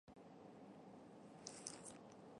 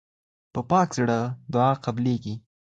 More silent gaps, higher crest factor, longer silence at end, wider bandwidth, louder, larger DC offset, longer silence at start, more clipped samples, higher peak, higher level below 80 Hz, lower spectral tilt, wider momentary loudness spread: neither; first, 30 dB vs 18 dB; second, 0 s vs 0.35 s; first, 11.5 kHz vs 9 kHz; second, -57 LUFS vs -25 LUFS; neither; second, 0.05 s vs 0.55 s; neither; second, -28 dBFS vs -8 dBFS; second, -84 dBFS vs -58 dBFS; second, -3 dB/octave vs -7 dB/octave; second, 9 LU vs 13 LU